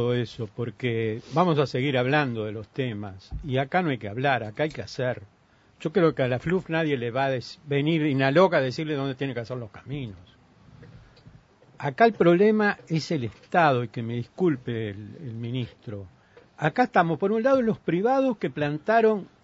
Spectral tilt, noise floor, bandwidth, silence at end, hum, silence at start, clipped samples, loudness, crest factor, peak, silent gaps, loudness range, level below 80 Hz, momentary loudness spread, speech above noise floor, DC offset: -7.5 dB/octave; -54 dBFS; 8 kHz; 0.2 s; none; 0 s; under 0.1%; -25 LUFS; 20 dB; -6 dBFS; none; 5 LU; -56 dBFS; 14 LU; 30 dB; under 0.1%